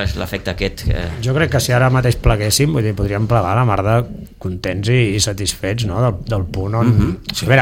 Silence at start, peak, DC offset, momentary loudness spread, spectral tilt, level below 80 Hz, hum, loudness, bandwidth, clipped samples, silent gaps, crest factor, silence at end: 0 s; 0 dBFS; under 0.1%; 8 LU; -5 dB/octave; -28 dBFS; none; -17 LUFS; 16.5 kHz; under 0.1%; none; 16 dB; 0 s